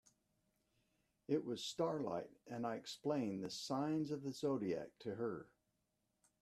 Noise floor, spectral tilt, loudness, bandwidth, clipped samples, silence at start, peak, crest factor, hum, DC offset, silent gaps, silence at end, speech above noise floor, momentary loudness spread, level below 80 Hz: -85 dBFS; -5.5 dB/octave; -43 LUFS; 14 kHz; under 0.1%; 1.3 s; -24 dBFS; 20 dB; none; under 0.1%; none; 0.95 s; 43 dB; 7 LU; -82 dBFS